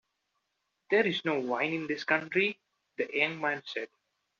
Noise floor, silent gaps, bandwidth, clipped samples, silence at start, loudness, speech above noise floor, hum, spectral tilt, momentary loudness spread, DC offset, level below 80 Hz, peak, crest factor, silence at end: -81 dBFS; none; 7.2 kHz; under 0.1%; 0.9 s; -30 LUFS; 51 dB; none; -2 dB/octave; 12 LU; under 0.1%; -80 dBFS; -10 dBFS; 22 dB; 0.55 s